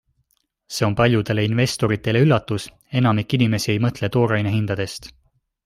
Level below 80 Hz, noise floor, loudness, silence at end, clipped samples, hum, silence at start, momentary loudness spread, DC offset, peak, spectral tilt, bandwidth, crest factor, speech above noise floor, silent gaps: -50 dBFS; -68 dBFS; -20 LUFS; 0.55 s; under 0.1%; none; 0.7 s; 10 LU; under 0.1%; -2 dBFS; -6 dB/octave; 15 kHz; 18 dB; 48 dB; none